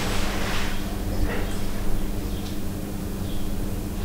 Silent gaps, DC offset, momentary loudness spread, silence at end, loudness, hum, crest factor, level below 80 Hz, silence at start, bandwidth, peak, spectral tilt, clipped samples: none; under 0.1%; 5 LU; 0 s; -30 LUFS; none; 14 dB; -30 dBFS; 0 s; 16 kHz; -10 dBFS; -5 dB/octave; under 0.1%